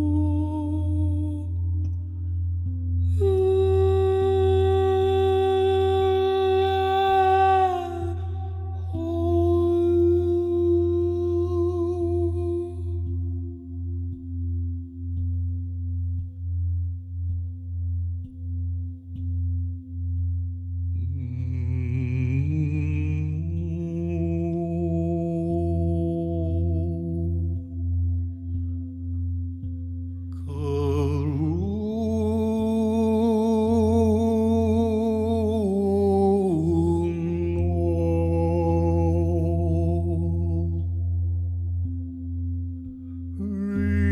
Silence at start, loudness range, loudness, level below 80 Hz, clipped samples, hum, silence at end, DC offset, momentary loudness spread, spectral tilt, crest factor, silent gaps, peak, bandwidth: 0 s; 9 LU; -25 LUFS; -36 dBFS; under 0.1%; none; 0 s; under 0.1%; 11 LU; -9 dB/octave; 12 dB; none; -10 dBFS; 6.6 kHz